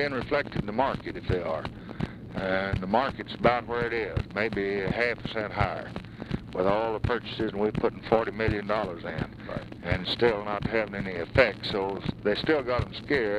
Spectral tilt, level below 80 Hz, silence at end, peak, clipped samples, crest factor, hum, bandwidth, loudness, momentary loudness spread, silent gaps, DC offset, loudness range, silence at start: -7 dB/octave; -46 dBFS; 0 s; -6 dBFS; under 0.1%; 22 dB; none; 11 kHz; -29 LUFS; 10 LU; none; under 0.1%; 2 LU; 0 s